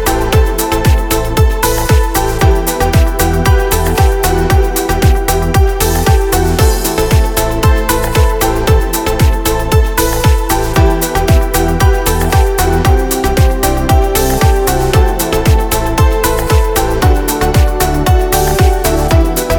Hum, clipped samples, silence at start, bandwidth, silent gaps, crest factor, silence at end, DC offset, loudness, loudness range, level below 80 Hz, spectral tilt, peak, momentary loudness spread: none; under 0.1%; 0 s; over 20 kHz; none; 10 dB; 0 s; under 0.1%; -12 LUFS; 1 LU; -14 dBFS; -5 dB/octave; 0 dBFS; 2 LU